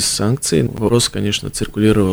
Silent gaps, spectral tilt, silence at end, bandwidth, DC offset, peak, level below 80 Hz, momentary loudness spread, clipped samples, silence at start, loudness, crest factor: none; -4.5 dB/octave; 0 s; over 20 kHz; under 0.1%; -2 dBFS; -36 dBFS; 5 LU; under 0.1%; 0 s; -17 LUFS; 14 dB